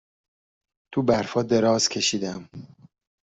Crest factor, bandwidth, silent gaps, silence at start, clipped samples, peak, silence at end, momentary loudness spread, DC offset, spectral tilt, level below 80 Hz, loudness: 20 dB; 8.2 kHz; none; 0.9 s; under 0.1%; -6 dBFS; 0.6 s; 18 LU; under 0.1%; -4 dB/octave; -60 dBFS; -23 LUFS